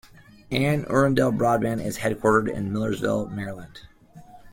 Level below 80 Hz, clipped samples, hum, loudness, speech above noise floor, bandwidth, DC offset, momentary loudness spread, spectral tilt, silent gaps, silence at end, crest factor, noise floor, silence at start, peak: -52 dBFS; under 0.1%; none; -24 LUFS; 24 dB; 16.5 kHz; under 0.1%; 12 LU; -6.5 dB/octave; none; 0 s; 18 dB; -48 dBFS; 0.5 s; -6 dBFS